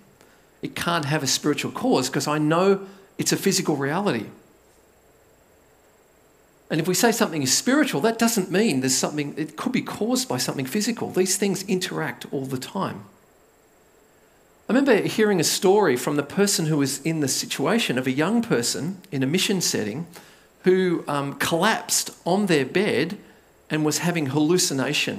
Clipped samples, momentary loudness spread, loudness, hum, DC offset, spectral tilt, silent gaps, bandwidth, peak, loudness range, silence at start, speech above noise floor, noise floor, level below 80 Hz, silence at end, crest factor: under 0.1%; 10 LU; -22 LUFS; none; under 0.1%; -4 dB/octave; none; 16 kHz; -4 dBFS; 6 LU; 0.65 s; 35 dB; -57 dBFS; -66 dBFS; 0 s; 20 dB